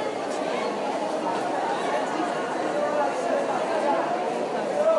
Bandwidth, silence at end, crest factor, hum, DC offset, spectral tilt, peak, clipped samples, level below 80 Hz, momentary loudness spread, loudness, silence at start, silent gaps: 11.5 kHz; 0 s; 14 dB; none; under 0.1%; -4 dB/octave; -12 dBFS; under 0.1%; -80 dBFS; 3 LU; -26 LUFS; 0 s; none